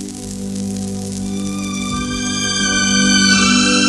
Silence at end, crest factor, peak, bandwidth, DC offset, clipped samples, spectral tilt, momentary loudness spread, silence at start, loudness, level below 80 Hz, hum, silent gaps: 0 s; 16 dB; 0 dBFS; 12.5 kHz; under 0.1%; under 0.1%; -2.5 dB/octave; 13 LU; 0 s; -15 LUFS; -38 dBFS; 50 Hz at -40 dBFS; none